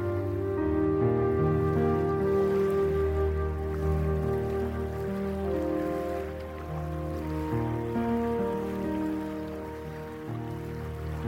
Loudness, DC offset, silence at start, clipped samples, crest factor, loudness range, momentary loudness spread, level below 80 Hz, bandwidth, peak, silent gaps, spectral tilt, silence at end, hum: -30 LUFS; under 0.1%; 0 s; under 0.1%; 14 dB; 5 LU; 11 LU; -42 dBFS; 16 kHz; -16 dBFS; none; -9 dB/octave; 0 s; none